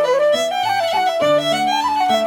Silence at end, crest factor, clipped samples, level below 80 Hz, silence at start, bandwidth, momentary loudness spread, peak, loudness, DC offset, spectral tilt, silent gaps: 0 s; 12 dB; under 0.1%; -60 dBFS; 0 s; 18 kHz; 2 LU; -6 dBFS; -17 LUFS; under 0.1%; -3 dB/octave; none